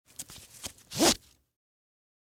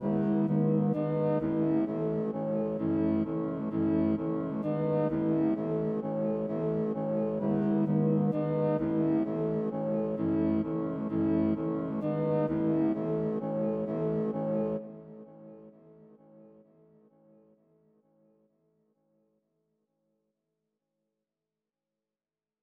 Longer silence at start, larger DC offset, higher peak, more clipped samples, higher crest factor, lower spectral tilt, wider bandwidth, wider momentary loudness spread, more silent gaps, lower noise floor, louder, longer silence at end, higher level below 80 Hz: first, 0.2 s vs 0 s; neither; first, -10 dBFS vs -16 dBFS; neither; first, 24 dB vs 14 dB; second, -2 dB/octave vs -12 dB/octave; first, 18 kHz vs 4.5 kHz; first, 19 LU vs 5 LU; neither; second, -47 dBFS vs under -90 dBFS; first, -27 LUFS vs -30 LUFS; second, 1.1 s vs 6.15 s; about the same, -58 dBFS vs -62 dBFS